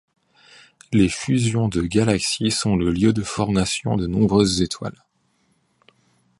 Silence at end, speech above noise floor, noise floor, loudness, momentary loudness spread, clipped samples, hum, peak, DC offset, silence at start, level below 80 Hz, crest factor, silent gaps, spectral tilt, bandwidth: 1.5 s; 46 dB; -65 dBFS; -20 LUFS; 5 LU; under 0.1%; none; -2 dBFS; under 0.1%; 0.9 s; -42 dBFS; 20 dB; none; -5 dB/octave; 11.5 kHz